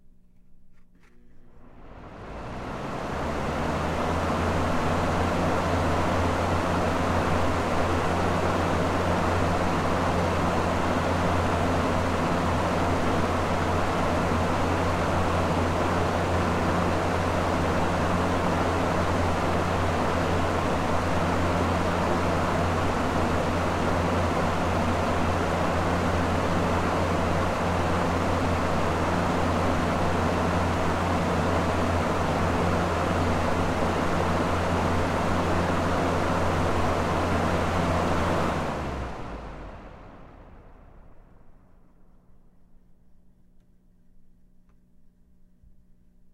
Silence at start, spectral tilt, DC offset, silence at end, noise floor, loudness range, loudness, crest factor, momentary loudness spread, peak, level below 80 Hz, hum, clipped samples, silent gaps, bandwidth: 0.5 s; -6 dB/octave; under 0.1%; 4 s; -56 dBFS; 3 LU; -25 LUFS; 14 dB; 1 LU; -10 dBFS; -40 dBFS; none; under 0.1%; none; 15.5 kHz